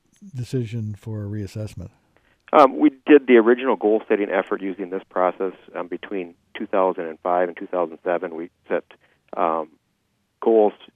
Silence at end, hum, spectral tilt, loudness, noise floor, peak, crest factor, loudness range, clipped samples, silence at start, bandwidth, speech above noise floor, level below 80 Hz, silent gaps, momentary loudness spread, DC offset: 0.25 s; none; -8 dB/octave; -21 LUFS; -70 dBFS; 0 dBFS; 22 dB; 7 LU; under 0.1%; 0.2 s; 9.8 kHz; 49 dB; -62 dBFS; none; 18 LU; under 0.1%